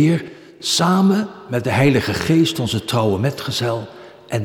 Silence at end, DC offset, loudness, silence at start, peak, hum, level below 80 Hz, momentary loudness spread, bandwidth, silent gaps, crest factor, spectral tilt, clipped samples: 0 s; under 0.1%; -18 LUFS; 0 s; -4 dBFS; none; -50 dBFS; 11 LU; 18 kHz; none; 16 dB; -5.5 dB/octave; under 0.1%